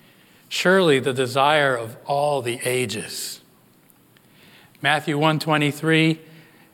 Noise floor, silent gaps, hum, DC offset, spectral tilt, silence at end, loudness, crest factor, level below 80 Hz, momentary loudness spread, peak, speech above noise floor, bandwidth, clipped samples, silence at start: -55 dBFS; none; none; under 0.1%; -4.5 dB/octave; 0.5 s; -21 LUFS; 18 dB; -76 dBFS; 12 LU; -4 dBFS; 35 dB; 17.5 kHz; under 0.1%; 0.5 s